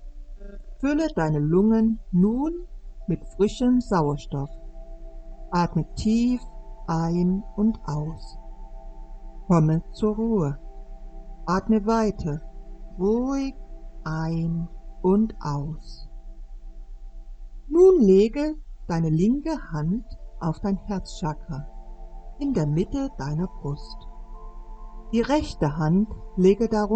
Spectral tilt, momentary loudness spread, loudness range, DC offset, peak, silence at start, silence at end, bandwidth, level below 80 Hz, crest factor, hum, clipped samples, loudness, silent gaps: -8 dB/octave; 25 LU; 7 LU; under 0.1%; -6 dBFS; 0 s; 0 s; 8.6 kHz; -38 dBFS; 18 dB; none; under 0.1%; -24 LUFS; none